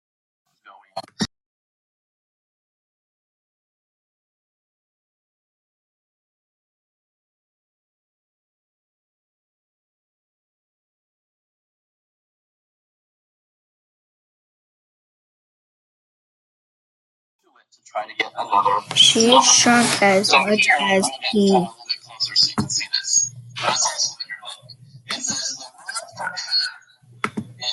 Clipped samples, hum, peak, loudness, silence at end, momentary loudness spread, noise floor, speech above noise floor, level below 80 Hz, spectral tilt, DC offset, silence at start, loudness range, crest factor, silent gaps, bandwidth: under 0.1%; none; 0 dBFS; -17 LUFS; 0 s; 18 LU; -50 dBFS; 34 dB; -68 dBFS; -1.5 dB/octave; under 0.1%; 0.95 s; 22 LU; 24 dB; 1.46-17.39 s; 12.5 kHz